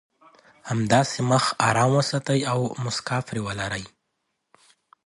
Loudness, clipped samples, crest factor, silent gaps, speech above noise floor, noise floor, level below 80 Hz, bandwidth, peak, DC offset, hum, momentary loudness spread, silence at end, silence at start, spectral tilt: -23 LUFS; under 0.1%; 22 dB; none; 54 dB; -77 dBFS; -56 dBFS; 11.5 kHz; -4 dBFS; under 0.1%; none; 10 LU; 1.2 s; 0.65 s; -5 dB/octave